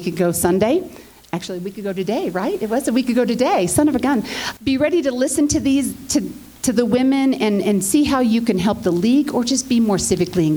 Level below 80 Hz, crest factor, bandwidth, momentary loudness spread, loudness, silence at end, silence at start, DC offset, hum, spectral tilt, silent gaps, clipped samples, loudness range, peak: -46 dBFS; 16 dB; over 20 kHz; 8 LU; -18 LUFS; 0 s; 0 s; under 0.1%; none; -4.5 dB/octave; none; under 0.1%; 3 LU; -2 dBFS